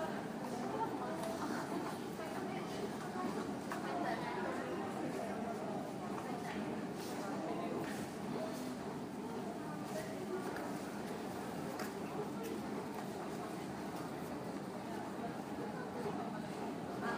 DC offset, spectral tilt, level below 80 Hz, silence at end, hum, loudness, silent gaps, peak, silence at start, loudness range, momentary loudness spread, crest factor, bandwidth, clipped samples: under 0.1%; -5.5 dB/octave; -74 dBFS; 0 s; none; -43 LUFS; none; -28 dBFS; 0 s; 2 LU; 4 LU; 14 dB; 15.5 kHz; under 0.1%